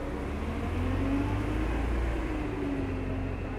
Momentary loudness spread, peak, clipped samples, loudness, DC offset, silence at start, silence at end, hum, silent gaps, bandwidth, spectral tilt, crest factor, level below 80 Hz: 5 LU; -18 dBFS; under 0.1%; -32 LUFS; under 0.1%; 0 s; 0 s; none; none; 12 kHz; -7.5 dB/octave; 12 dB; -34 dBFS